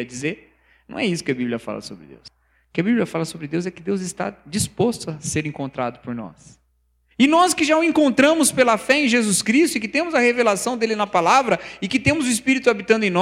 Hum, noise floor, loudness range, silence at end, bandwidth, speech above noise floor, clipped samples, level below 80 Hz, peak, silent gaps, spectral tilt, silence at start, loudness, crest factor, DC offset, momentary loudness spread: none; -64 dBFS; 9 LU; 0 s; 16 kHz; 45 dB; under 0.1%; -54 dBFS; -2 dBFS; none; -4 dB/octave; 0 s; -19 LUFS; 18 dB; under 0.1%; 13 LU